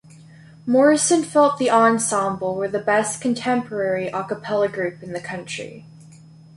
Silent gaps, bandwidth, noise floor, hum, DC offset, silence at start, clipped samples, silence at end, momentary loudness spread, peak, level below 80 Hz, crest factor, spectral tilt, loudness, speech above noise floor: none; 11.5 kHz; -45 dBFS; none; under 0.1%; 0.65 s; under 0.1%; 0.55 s; 14 LU; -4 dBFS; -64 dBFS; 18 dB; -4 dB/octave; -20 LUFS; 25 dB